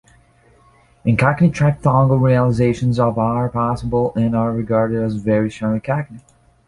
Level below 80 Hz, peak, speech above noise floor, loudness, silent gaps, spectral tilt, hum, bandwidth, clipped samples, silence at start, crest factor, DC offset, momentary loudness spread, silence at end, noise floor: -42 dBFS; -2 dBFS; 36 dB; -17 LUFS; none; -8.5 dB/octave; none; 11 kHz; under 0.1%; 1.05 s; 16 dB; under 0.1%; 7 LU; 0.5 s; -52 dBFS